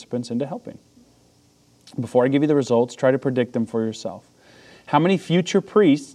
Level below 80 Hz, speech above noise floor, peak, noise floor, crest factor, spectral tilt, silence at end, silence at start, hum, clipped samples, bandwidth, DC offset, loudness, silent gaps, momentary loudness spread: -70 dBFS; 37 dB; -2 dBFS; -57 dBFS; 20 dB; -6.5 dB/octave; 0.05 s; 0 s; none; under 0.1%; 11 kHz; under 0.1%; -21 LUFS; none; 16 LU